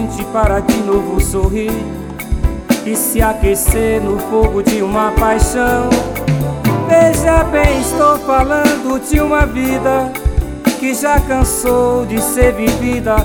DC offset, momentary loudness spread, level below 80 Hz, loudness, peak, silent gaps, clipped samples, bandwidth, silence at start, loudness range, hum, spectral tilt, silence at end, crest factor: under 0.1%; 6 LU; -20 dBFS; -14 LUFS; 0 dBFS; none; under 0.1%; over 20 kHz; 0 s; 3 LU; none; -5.5 dB/octave; 0 s; 12 dB